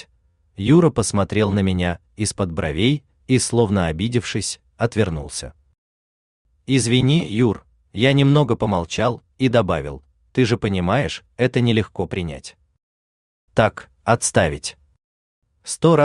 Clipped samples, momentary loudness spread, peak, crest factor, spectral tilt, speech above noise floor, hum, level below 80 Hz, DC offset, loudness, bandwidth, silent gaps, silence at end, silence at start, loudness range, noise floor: under 0.1%; 14 LU; -2 dBFS; 18 dB; -5.5 dB/octave; 42 dB; none; -46 dBFS; under 0.1%; -20 LUFS; 12.5 kHz; 5.78-6.45 s, 12.83-13.48 s, 15.04-15.42 s; 0 s; 0.6 s; 4 LU; -61 dBFS